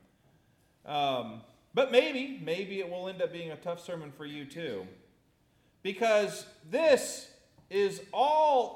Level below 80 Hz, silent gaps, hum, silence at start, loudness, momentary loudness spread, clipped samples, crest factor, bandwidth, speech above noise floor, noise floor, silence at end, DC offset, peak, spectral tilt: -76 dBFS; none; none; 0.85 s; -31 LUFS; 17 LU; under 0.1%; 22 dB; 16.5 kHz; 38 dB; -68 dBFS; 0 s; under 0.1%; -10 dBFS; -3.5 dB/octave